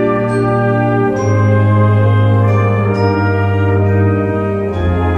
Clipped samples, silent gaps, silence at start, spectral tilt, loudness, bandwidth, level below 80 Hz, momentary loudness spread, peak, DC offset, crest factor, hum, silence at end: under 0.1%; none; 0 s; -9 dB/octave; -13 LUFS; 6 kHz; -34 dBFS; 4 LU; -2 dBFS; under 0.1%; 10 dB; none; 0 s